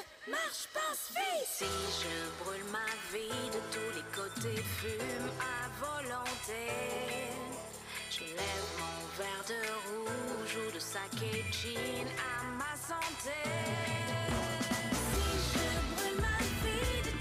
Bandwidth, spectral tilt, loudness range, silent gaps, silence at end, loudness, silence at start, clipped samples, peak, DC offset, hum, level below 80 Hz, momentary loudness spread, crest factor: 15.5 kHz; -3.5 dB/octave; 4 LU; none; 0 s; -37 LUFS; 0 s; under 0.1%; -24 dBFS; under 0.1%; none; -48 dBFS; 6 LU; 14 dB